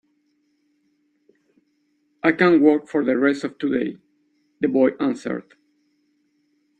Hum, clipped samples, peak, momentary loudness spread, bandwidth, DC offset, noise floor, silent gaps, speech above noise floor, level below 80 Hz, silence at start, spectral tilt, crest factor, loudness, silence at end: none; under 0.1%; -2 dBFS; 13 LU; 9 kHz; under 0.1%; -67 dBFS; none; 48 dB; -66 dBFS; 2.25 s; -7 dB/octave; 20 dB; -20 LUFS; 1.4 s